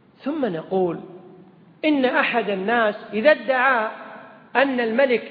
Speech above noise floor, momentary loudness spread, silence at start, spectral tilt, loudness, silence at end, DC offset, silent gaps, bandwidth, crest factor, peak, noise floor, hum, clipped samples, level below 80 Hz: 28 dB; 10 LU; 0.25 s; -8.5 dB/octave; -21 LUFS; 0 s; under 0.1%; none; 5 kHz; 20 dB; -2 dBFS; -48 dBFS; none; under 0.1%; -70 dBFS